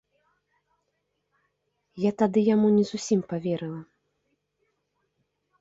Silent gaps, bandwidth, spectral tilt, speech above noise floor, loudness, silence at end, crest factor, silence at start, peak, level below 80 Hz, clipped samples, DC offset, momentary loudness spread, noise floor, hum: none; 7.8 kHz; -6.5 dB/octave; 54 dB; -25 LUFS; 1.75 s; 18 dB; 1.95 s; -10 dBFS; -70 dBFS; under 0.1%; under 0.1%; 11 LU; -77 dBFS; none